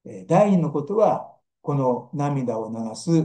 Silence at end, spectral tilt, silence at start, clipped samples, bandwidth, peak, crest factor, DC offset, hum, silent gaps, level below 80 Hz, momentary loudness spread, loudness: 0 s; -8 dB/octave; 0.05 s; under 0.1%; 10 kHz; -6 dBFS; 16 dB; under 0.1%; none; none; -70 dBFS; 11 LU; -23 LUFS